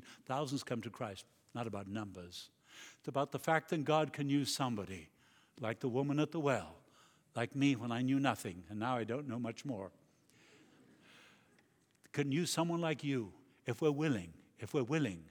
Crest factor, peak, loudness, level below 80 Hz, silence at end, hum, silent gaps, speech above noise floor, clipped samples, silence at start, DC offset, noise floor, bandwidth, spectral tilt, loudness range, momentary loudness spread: 22 dB; -16 dBFS; -38 LUFS; -76 dBFS; 0 s; none; none; 35 dB; under 0.1%; 0 s; under 0.1%; -72 dBFS; 18.5 kHz; -5.5 dB/octave; 7 LU; 15 LU